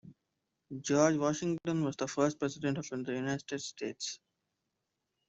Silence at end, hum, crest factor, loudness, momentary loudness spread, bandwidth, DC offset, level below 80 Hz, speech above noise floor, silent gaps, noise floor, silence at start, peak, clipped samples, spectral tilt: 1.15 s; none; 20 dB; -34 LUFS; 12 LU; 8.2 kHz; under 0.1%; -72 dBFS; 52 dB; none; -85 dBFS; 0.05 s; -14 dBFS; under 0.1%; -5 dB/octave